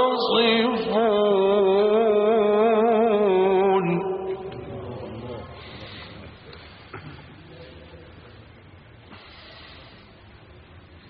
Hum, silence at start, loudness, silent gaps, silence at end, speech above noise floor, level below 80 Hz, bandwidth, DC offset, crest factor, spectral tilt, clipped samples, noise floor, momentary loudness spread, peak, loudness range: none; 0 s; -20 LUFS; none; 0.3 s; 28 dB; -56 dBFS; 5.2 kHz; under 0.1%; 16 dB; -3.5 dB/octave; under 0.1%; -48 dBFS; 24 LU; -8 dBFS; 24 LU